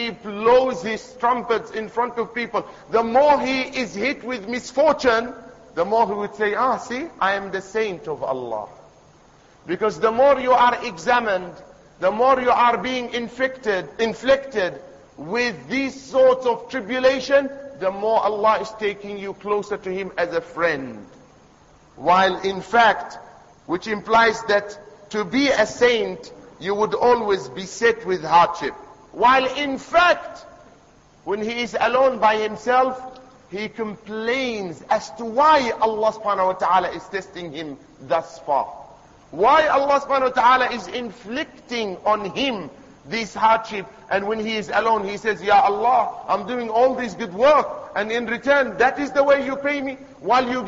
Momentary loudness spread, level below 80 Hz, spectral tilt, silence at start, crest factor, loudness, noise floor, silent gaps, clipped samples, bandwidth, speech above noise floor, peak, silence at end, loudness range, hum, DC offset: 14 LU; -56 dBFS; -4 dB/octave; 0 s; 16 dB; -20 LUFS; -52 dBFS; none; under 0.1%; 8 kHz; 32 dB; -4 dBFS; 0 s; 4 LU; none; under 0.1%